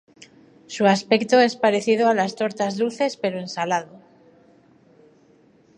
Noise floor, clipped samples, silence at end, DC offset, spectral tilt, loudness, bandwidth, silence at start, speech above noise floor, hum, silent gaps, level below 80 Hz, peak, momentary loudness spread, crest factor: -56 dBFS; under 0.1%; 1.8 s; under 0.1%; -4.5 dB/octave; -21 LUFS; 11 kHz; 0.7 s; 35 dB; none; none; -72 dBFS; -4 dBFS; 9 LU; 20 dB